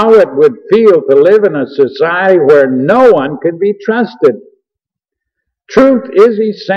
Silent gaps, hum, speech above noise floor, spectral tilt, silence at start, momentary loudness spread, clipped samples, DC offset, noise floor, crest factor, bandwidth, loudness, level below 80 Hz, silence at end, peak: none; none; 73 dB; -7 dB/octave; 0 s; 7 LU; 0.3%; under 0.1%; -81 dBFS; 8 dB; 6.6 kHz; -9 LUFS; -52 dBFS; 0 s; 0 dBFS